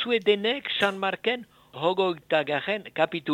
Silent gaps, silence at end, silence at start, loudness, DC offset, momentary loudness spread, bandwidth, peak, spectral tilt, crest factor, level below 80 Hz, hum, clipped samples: none; 0 s; 0 s; -26 LUFS; under 0.1%; 6 LU; 16 kHz; -6 dBFS; -5 dB/octave; 20 dB; -70 dBFS; none; under 0.1%